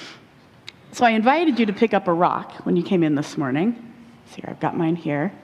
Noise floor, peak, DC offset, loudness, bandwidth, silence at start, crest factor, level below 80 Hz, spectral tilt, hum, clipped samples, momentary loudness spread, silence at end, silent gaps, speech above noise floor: -50 dBFS; -4 dBFS; under 0.1%; -21 LUFS; 12 kHz; 0 s; 18 dB; -64 dBFS; -6.5 dB/octave; none; under 0.1%; 18 LU; 0.05 s; none; 29 dB